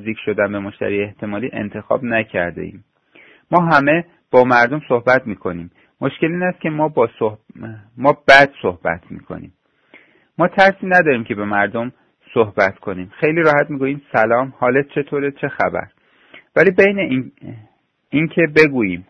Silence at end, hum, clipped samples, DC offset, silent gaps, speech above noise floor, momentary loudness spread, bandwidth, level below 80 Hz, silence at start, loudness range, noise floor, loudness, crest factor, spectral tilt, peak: 0.1 s; none; under 0.1%; under 0.1%; none; 33 dB; 16 LU; 11 kHz; -54 dBFS; 0 s; 3 LU; -50 dBFS; -16 LUFS; 18 dB; -7 dB/octave; 0 dBFS